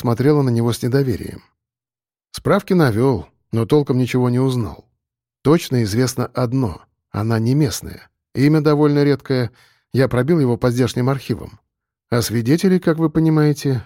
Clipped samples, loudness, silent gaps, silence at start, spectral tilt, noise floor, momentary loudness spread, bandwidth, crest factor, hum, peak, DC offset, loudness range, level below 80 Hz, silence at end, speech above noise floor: under 0.1%; -18 LUFS; none; 0 s; -7 dB/octave; under -90 dBFS; 11 LU; 16.5 kHz; 14 dB; none; -4 dBFS; under 0.1%; 2 LU; -46 dBFS; 0.05 s; over 73 dB